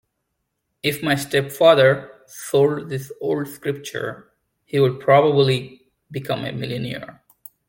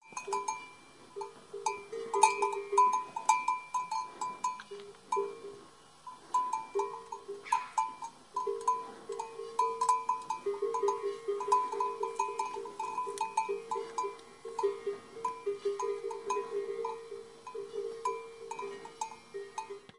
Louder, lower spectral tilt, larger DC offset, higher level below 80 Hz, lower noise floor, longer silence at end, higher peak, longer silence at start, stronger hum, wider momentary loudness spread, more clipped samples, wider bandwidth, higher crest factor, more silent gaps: first, -20 LUFS vs -35 LUFS; first, -5.5 dB/octave vs -2 dB/octave; neither; first, -60 dBFS vs -78 dBFS; first, -76 dBFS vs -56 dBFS; first, 0.55 s vs 0.1 s; first, -2 dBFS vs -8 dBFS; first, 0.85 s vs 0.05 s; neither; about the same, 17 LU vs 15 LU; neither; first, 17 kHz vs 11.5 kHz; second, 20 dB vs 28 dB; neither